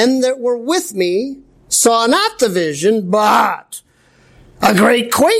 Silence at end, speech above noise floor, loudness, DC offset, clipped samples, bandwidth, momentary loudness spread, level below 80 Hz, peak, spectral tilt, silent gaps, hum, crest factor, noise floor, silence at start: 0 s; 37 dB; -14 LUFS; under 0.1%; under 0.1%; 16 kHz; 9 LU; -54 dBFS; -2 dBFS; -3 dB/octave; none; none; 14 dB; -51 dBFS; 0 s